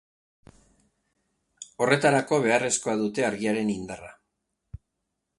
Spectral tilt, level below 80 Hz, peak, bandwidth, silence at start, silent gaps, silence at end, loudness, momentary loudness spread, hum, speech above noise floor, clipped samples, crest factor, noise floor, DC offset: -4 dB/octave; -60 dBFS; -4 dBFS; 11.5 kHz; 1.6 s; none; 0.6 s; -24 LUFS; 18 LU; none; 56 dB; under 0.1%; 24 dB; -81 dBFS; under 0.1%